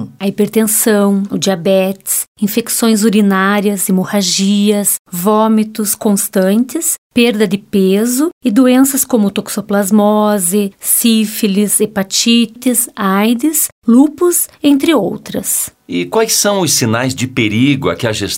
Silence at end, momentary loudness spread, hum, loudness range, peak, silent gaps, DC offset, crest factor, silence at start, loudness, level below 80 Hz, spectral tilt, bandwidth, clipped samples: 0 s; 5 LU; none; 1 LU; 0 dBFS; 2.28-2.35 s, 4.99-5.05 s, 6.98-7.10 s, 8.33-8.41 s, 13.72-13.82 s; under 0.1%; 12 dB; 0 s; -12 LUFS; -54 dBFS; -4 dB/octave; 16.5 kHz; under 0.1%